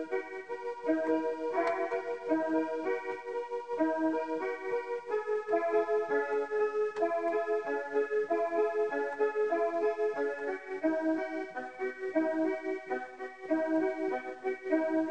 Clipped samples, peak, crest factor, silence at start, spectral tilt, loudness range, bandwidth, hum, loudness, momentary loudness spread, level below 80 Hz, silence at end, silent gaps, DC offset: under 0.1%; -16 dBFS; 16 dB; 0 s; -5.5 dB/octave; 3 LU; 8.8 kHz; none; -33 LUFS; 7 LU; -78 dBFS; 0 s; none; 0.1%